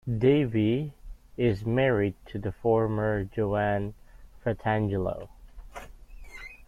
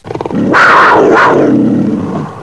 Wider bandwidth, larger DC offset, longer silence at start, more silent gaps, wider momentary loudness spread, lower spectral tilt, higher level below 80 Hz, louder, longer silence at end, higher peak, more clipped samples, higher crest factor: about the same, 11 kHz vs 11 kHz; neither; about the same, 0.05 s vs 0.05 s; neither; first, 21 LU vs 12 LU; first, -8.5 dB/octave vs -6 dB/octave; about the same, -48 dBFS vs -44 dBFS; second, -27 LUFS vs -7 LUFS; about the same, 0.05 s vs 0 s; second, -10 dBFS vs 0 dBFS; second, under 0.1% vs 0.9%; first, 18 dB vs 8 dB